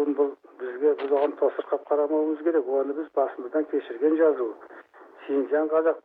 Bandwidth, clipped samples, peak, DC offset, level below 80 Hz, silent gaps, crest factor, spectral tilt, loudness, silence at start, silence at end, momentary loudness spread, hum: 4.1 kHz; under 0.1%; -10 dBFS; under 0.1%; -86 dBFS; none; 14 dB; -7.5 dB/octave; -25 LUFS; 0 s; 0.05 s; 8 LU; none